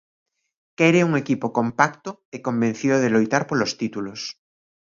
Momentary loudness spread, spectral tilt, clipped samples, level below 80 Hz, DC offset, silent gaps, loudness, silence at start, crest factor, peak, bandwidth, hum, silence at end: 14 LU; -5.5 dB/octave; under 0.1%; -64 dBFS; under 0.1%; 2.25-2.32 s; -21 LUFS; 0.8 s; 22 dB; 0 dBFS; 7.6 kHz; none; 0.55 s